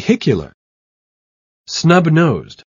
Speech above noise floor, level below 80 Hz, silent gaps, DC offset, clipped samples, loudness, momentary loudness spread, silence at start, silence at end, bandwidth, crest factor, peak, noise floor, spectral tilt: over 76 dB; -48 dBFS; 0.54-1.64 s; under 0.1%; under 0.1%; -14 LUFS; 12 LU; 0 s; 0.2 s; 7.4 kHz; 16 dB; 0 dBFS; under -90 dBFS; -6 dB/octave